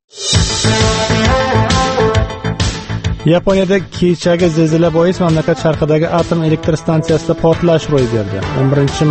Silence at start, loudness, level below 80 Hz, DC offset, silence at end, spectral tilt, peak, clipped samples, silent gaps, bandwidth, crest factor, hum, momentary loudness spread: 0.15 s; -13 LUFS; -28 dBFS; under 0.1%; 0 s; -5.5 dB/octave; 0 dBFS; under 0.1%; none; 8.8 kHz; 12 dB; none; 5 LU